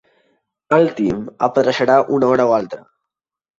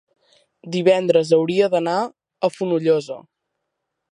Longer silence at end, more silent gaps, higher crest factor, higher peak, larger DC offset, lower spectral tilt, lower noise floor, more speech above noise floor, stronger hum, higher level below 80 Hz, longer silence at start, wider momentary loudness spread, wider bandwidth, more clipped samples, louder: second, 0.8 s vs 0.95 s; neither; about the same, 16 dB vs 18 dB; about the same, -2 dBFS vs -4 dBFS; neither; about the same, -6.5 dB/octave vs -6 dB/octave; first, -82 dBFS vs -78 dBFS; first, 66 dB vs 60 dB; neither; first, -54 dBFS vs -72 dBFS; about the same, 0.7 s vs 0.65 s; second, 7 LU vs 12 LU; second, 7.6 kHz vs 11 kHz; neither; first, -16 LUFS vs -19 LUFS